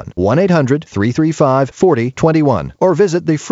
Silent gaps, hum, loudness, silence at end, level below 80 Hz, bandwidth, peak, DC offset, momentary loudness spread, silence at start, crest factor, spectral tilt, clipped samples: none; none; -14 LUFS; 0 s; -44 dBFS; 8 kHz; 0 dBFS; under 0.1%; 4 LU; 0 s; 12 dB; -7 dB/octave; under 0.1%